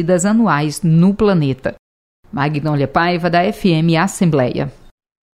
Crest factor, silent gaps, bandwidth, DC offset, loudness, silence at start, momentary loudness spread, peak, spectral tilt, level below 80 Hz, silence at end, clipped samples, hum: 14 dB; 1.79-2.23 s; 14.5 kHz; under 0.1%; -15 LUFS; 0 s; 10 LU; -2 dBFS; -6.5 dB/octave; -42 dBFS; 0.65 s; under 0.1%; none